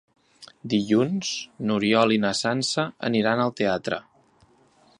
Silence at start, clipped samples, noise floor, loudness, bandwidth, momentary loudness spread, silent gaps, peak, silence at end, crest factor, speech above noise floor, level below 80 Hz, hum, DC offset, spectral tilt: 0.4 s; under 0.1%; -59 dBFS; -24 LUFS; 11 kHz; 9 LU; none; -6 dBFS; 1 s; 20 dB; 36 dB; -64 dBFS; none; under 0.1%; -4.5 dB/octave